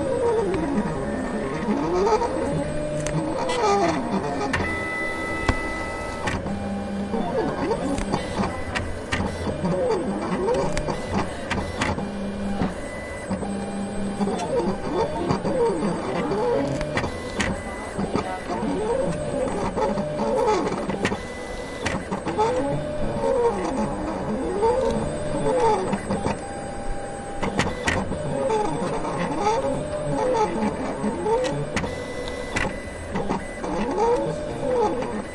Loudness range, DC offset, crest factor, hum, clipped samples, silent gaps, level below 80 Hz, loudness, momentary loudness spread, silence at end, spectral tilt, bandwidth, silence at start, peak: 3 LU; under 0.1%; 20 dB; none; under 0.1%; none; -38 dBFS; -25 LUFS; 7 LU; 0 s; -5.5 dB/octave; 11.5 kHz; 0 s; -4 dBFS